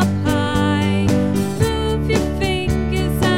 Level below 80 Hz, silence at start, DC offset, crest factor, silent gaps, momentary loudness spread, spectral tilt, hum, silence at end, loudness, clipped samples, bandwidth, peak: -28 dBFS; 0 s; 2%; 14 dB; none; 3 LU; -6 dB/octave; none; 0 s; -18 LUFS; under 0.1%; 17.5 kHz; -4 dBFS